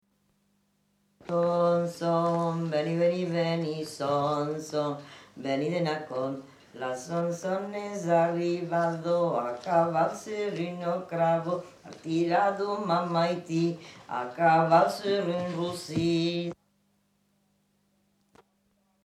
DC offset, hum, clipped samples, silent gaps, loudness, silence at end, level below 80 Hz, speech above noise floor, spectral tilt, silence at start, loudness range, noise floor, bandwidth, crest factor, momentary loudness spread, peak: under 0.1%; 50 Hz at -65 dBFS; under 0.1%; none; -28 LUFS; 2.5 s; -70 dBFS; 43 dB; -6.5 dB/octave; 1.25 s; 5 LU; -71 dBFS; 13.5 kHz; 20 dB; 10 LU; -10 dBFS